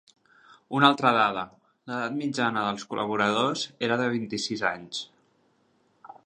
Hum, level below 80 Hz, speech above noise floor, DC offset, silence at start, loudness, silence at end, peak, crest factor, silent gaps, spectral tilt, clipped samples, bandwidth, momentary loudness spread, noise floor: none; -70 dBFS; 41 dB; under 0.1%; 0.5 s; -26 LUFS; 0.15 s; -4 dBFS; 24 dB; none; -4.5 dB/octave; under 0.1%; 10 kHz; 14 LU; -67 dBFS